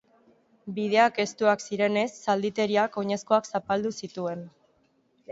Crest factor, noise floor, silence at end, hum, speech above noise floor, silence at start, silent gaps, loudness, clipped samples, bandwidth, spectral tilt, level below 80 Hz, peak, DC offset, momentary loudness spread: 20 dB; -67 dBFS; 0 s; none; 41 dB; 0.65 s; none; -26 LUFS; under 0.1%; 8 kHz; -4.5 dB/octave; -70 dBFS; -8 dBFS; under 0.1%; 11 LU